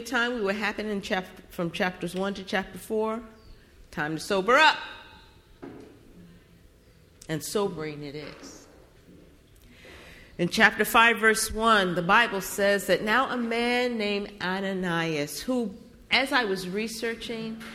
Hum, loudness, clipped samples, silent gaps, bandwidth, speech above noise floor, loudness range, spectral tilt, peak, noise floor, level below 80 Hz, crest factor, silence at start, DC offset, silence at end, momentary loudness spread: none; -25 LUFS; under 0.1%; none; 16.5 kHz; 30 dB; 14 LU; -3.5 dB/octave; -4 dBFS; -56 dBFS; -54 dBFS; 22 dB; 0 s; under 0.1%; 0 s; 19 LU